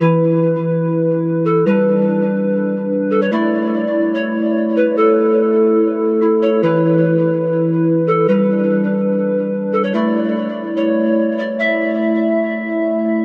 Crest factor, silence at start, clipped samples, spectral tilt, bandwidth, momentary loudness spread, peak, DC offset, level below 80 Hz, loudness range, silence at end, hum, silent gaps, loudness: 12 dB; 0 s; under 0.1%; -10 dB/octave; 5.2 kHz; 5 LU; -2 dBFS; under 0.1%; -72 dBFS; 3 LU; 0 s; none; none; -16 LUFS